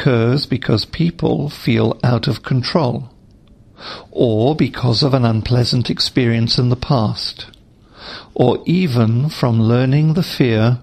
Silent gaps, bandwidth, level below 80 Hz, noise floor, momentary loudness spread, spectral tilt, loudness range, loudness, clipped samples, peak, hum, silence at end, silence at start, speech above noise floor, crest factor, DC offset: none; 14 kHz; -42 dBFS; -46 dBFS; 13 LU; -7 dB/octave; 3 LU; -16 LUFS; under 0.1%; 0 dBFS; none; 0 s; 0 s; 30 dB; 16 dB; under 0.1%